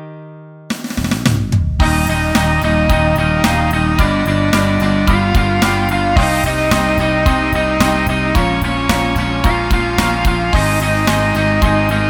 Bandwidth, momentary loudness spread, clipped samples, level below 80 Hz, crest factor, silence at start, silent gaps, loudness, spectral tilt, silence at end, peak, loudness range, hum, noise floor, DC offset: 19 kHz; 3 LU; under 0.1%; -20 dBFS; 14 dB; 0 s; none; -15 LUFS; -5.5 dB/octave; 0 s; 0 dBFS; 1 LU; none; -35 dBFS; under 0.1%